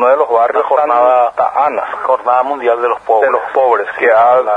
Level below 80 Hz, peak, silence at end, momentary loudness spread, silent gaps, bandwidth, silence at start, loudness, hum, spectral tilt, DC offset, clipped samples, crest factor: -58 dBFS; 0 dBFS; 0 s; 5 LU; none; 9.8 kHz; 0 s; -12 LUFS; none; -5 dB/octave; under 0.1%; under 0.1%; 12 dB